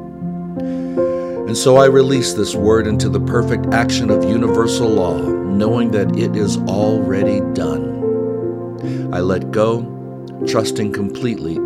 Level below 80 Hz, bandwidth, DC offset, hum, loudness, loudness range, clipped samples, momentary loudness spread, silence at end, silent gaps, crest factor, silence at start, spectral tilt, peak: -44 dBFS; 15 kHz; under 0.1%; none; -17 LUFS; 5 LU; under 0.1%; 9 LU; 0 s; none; 16 dB; 0 s; -6 dB/octave; 0 dBFS